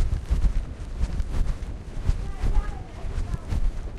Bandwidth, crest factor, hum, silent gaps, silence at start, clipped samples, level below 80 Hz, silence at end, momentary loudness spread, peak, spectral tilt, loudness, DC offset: 10.5 kHz; 16 dB; none; none; 0 s; under 0.1%; -26 dBFS; 0 s; 9 LU; -8 dBFS; -7 dB/octave; -31 LUFS; under 0.1%